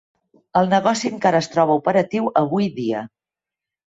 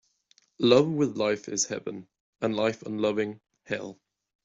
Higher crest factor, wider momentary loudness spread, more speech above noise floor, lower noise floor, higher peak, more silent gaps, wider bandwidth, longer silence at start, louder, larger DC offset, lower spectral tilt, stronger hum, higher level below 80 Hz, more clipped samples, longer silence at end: second, 16 dB vs 22 dB; second, 8 LU vs 14 LU; first, 70 dB vs 39 dB; first, -88 dBFS vs -66 dBFS; about the same, -4 dBFS vs -6 dBFS; second, none vs 2.20-2.33 s; about the same, 8 kHz vs 7.8 kHz; about the same, 0.55 s vs 0.6 s; first, -19 LUFS vs -27 LUFS; neither; first, -5.5 dB/octave vs -4 dB/octave; neither; first, -62 dBFS vs -68 dBFS; neither; first, 0.8 s vs 0.5 s